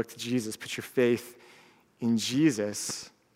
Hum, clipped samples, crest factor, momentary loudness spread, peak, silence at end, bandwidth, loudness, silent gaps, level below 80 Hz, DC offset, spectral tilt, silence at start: none; under 0.1%; 18 dB; 10 LU; -12 dBFS; 0.3 s; 16 kHz; -29 LUFS; none; -76 dBFS; under 0.1%; -4.5 dB/octave; 0 s